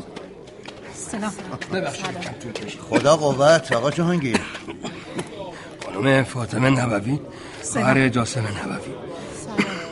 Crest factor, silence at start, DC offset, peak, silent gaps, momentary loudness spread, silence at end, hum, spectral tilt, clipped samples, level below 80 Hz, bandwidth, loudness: 20 dB; 0 s; under 0.1%; -2 dBFS; none; 18 LU; 0 s; none; -5 dB/octave; under 0.1%; -52 dBFS; 11.5 kHz; -22 LUFS